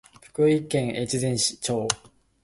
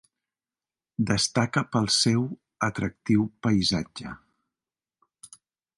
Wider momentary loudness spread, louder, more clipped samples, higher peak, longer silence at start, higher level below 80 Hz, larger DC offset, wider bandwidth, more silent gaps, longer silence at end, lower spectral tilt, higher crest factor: second, 7 LU vs 16 LU; about the same, -25 LUFS vs -25 LUFS; neither; first, 0 dBFS vs -8 dBFS; second, 0.4 s vs 1 s; about the same, -56 dBFS vs -54 dBFS; neither; about the same, 11.5 kHz vs 11.5 kHz; neither; about the same, 0.45 s vs 0.5 s; about the same, -4 dB/octave vs -4 dB/octave; first, 26 dB vs 20 dB